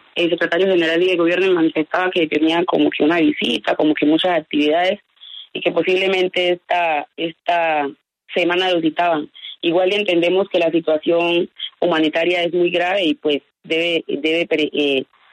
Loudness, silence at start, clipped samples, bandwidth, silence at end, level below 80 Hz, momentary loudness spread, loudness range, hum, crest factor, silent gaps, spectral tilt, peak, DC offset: -18 LUFS; 0.15 s; under 0.1%; 9.6 kHz; 0.3 s; -66 dBFS; 7 LU; 2 LU; none; 14 dB; none; -5.5 dB/octave; -4 dBFS; under 0.1%